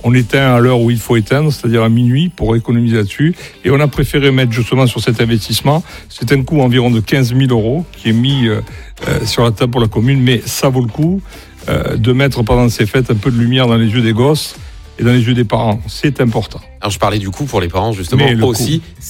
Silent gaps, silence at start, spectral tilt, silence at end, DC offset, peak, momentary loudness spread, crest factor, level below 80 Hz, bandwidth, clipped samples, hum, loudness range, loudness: none; 0 s; -6 dB/octave; 0 s; under 0.1%; 0 dBFS; 7 LU; 12 dB; -32 dBFS; 16.5 kHz; under 0.1%; none; 2 LU; -13 LUFS